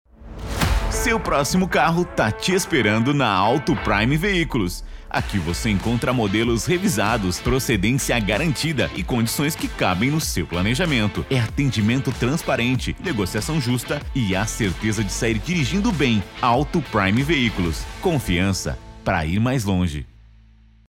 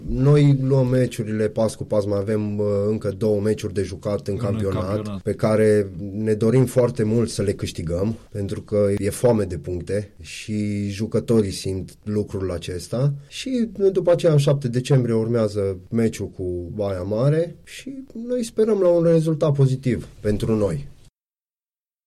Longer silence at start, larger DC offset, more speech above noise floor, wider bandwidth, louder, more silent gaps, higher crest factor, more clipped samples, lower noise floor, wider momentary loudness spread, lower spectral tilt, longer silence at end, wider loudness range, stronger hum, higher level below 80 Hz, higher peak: first, 0.2 s vs 0 s; neither; second, 30 dB vs over 69 dB; first, 16.5 kHz vs 13.5 kHz; about the same, -21 LUFS vs -22 LUFS; neither; about the same, 16 dB vs 14 dB; neither; second, -50 dBFS vs under -90 dBFS; second, 6 LU vs 11 LU; second, -5 dB/octave vs -7.5 dB/octave; second, 0.8 s vs 1.15 s; about the same, 3 LU vs 4 LU; neither; first, -34 dBFS vs -44 dBFS; about the same, -6 dBFS vs -8 dBFS